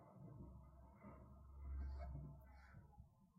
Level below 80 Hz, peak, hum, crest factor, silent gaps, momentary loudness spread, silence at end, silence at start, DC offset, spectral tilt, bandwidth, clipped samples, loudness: -56 dBFS; -42 dBFS; none; 14 dB; none; 13 LU; 0 s; 0 s; under 0.1%; -9 dB/octave; 5.4 kHz; under 0.1%; -58 LUFS